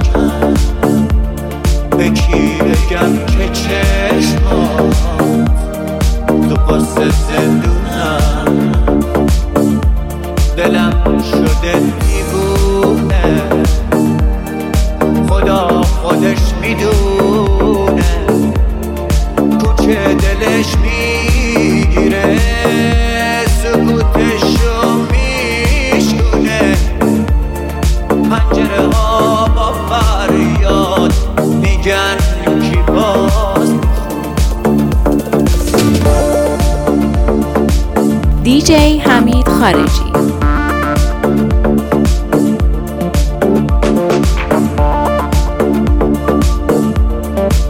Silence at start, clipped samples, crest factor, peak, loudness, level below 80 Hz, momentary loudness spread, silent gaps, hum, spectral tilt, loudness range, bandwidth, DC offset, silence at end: 0 s; under 0.1%; 10 dB; 0 dBFS; -12 LUFS; -16 dBFS; 4 LU; none; none; -6 dB/octave; 2 LU; 16.5 kHz; under 0.1%; 0 s